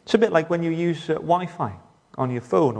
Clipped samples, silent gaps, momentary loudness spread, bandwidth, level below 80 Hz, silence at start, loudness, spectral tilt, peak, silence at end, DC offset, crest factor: under 0.1%; none; 11 LU; 9.8 kHz; -62 dBFS; 0.05 s; -23 LUFS; -7 dB/octave; -2 dBFS; 0 s; under 0.1%; 20 dB